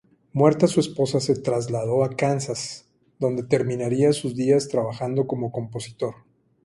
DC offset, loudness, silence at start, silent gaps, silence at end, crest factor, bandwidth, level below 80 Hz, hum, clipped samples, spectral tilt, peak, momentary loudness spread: under 0.1%; -23 LUFS; 0.35 s; none; 0.5 s; 20 dB; 11.5 kHz; -60 dBFS; none; under 0.1%; -6 dB/octave; -4 dBFS; 11 LU